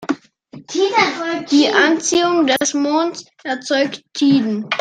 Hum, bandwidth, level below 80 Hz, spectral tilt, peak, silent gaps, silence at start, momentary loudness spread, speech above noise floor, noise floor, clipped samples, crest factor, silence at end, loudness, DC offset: none; 13.5 kHz; -64 dBFS; -3 dB/octave; 0 dBFS; none; 0 s; 12 LU; 25 dB; -41 dBFS; under 0.1%; 16 dB; 0 s; -17 LUFS; under 0.1%